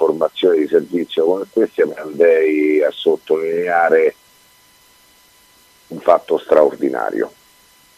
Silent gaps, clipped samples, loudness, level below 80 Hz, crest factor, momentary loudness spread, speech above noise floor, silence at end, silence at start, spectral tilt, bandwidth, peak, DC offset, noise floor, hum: none; under 0.1%; -16 LUFS; -66 dBFS; 16 dB; 7 LU; 35 dB; 0.7 s; 0 s; -5.5 dB/octave; 14.5 kHz; 0 dBFS; under 0.1%; -51 dBFS; none